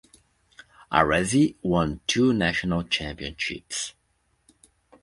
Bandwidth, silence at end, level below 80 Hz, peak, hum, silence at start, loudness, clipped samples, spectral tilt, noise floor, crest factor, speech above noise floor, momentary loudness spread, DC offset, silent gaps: 11.5 kHz; 1.1 s; -46 dBFS; -2 dBFS; none; 0.9 s; -24 LUFS; under 0.1%; -4.5 dB/octave; -70 dBFS; 24 dB; 46 dB; 10 LU; under 0.1%; none